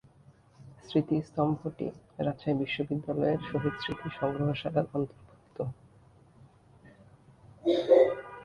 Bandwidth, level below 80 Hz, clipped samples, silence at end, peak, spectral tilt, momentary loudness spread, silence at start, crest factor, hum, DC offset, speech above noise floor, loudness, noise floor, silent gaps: 9.4 kHz; -62 dBFS; under 0.1%; 0 s; -10 dBFS; -8 dB/octave; 15 LU; 0.6 s; 22 dB; none; under 0.1%; 28 dB; -30 LUFS; -59 dBFS; none